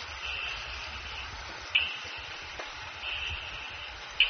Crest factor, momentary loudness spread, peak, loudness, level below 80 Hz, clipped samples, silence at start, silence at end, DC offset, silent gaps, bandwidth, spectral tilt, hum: 28 dB; 11 LU; -8 dBFS; -34 LUFS; -50 dBFS; under 0.1%; 0 s; 0 s; under 0.1%; none; 6.6 kHz; 1.5 dB/octave; none